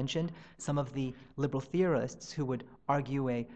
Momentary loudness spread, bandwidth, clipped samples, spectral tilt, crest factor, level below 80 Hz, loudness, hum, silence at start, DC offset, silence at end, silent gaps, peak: 8 LU; 9 kHz; under 0.1%; -6.5 dB/octave; 18 dB; -64 dBFS; -35 LUFS; none; 0 s; 0.1%; 0 s; none; -16 dBFS